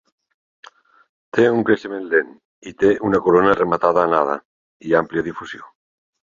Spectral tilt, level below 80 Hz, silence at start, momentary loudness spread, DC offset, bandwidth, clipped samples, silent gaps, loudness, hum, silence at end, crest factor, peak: -7 dB/octave; -54 dBFS; 1.35 s; 19 LU; under 0.1%; 7.4 kHz; under 0.1%; 2.45-2.62 s, 4.45-4.80 s; -18 LUFS; none; 0.65 s; 18 dB; -2 dBFS